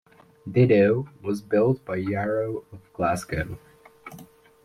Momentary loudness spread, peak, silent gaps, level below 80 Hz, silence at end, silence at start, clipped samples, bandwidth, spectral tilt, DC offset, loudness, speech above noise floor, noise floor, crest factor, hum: 24 LU; -8 dBFS; none; -52 dBFS; 0.4 s; 0.45 s; under 0.1%; 15 kHz; -7.5 dB/octave; under 0.1%; -24 LUFS; 25 dB; -48 dBFS; 18 dB; none